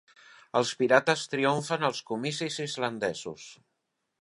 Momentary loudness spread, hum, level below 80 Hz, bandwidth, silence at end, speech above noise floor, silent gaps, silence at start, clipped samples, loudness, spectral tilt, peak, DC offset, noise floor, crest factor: 14 LU; none; -74 dBFS; 11.5 kHz; 0.65 s; 52 dB; none; 0.55 s; under 0.1%; -28 LUFS; -4 dB/octave; -4 dBFS; under 0.1%; -81 dBFS; 24 dB